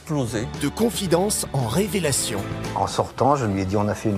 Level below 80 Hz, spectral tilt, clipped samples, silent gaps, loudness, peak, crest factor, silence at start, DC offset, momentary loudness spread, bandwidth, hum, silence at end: -44 dBFS; -4.5 dB/octave; under 0.1%; none; -23 LUFS; -6 dBFS; 18 dB; 0 s; under 0.1%; 6 LU; 16 kHz; none; 0 s